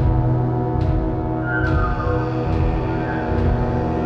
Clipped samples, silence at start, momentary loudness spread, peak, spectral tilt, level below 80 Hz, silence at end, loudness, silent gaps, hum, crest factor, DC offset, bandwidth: under 0.1%; 0 s; 3 LU; -8 dBFS; -9.5 dB/octave; -26 dBFS; 0 s; -21 LUFS; none; none; 12 dB; under 0.1%; 6 kHz